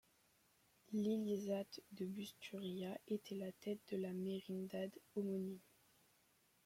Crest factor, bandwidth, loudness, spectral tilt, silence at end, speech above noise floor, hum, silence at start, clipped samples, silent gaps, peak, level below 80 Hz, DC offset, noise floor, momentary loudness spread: 16 dB; 16.5 kHz; -46 LUFS; -6.5 dB/octave; 1.05 s; 32 dB; none; 0.9 s; under 0.1%; none; -32 dBFS; -86 dBFS; under 0.1%; -77 dBFS; 8 LU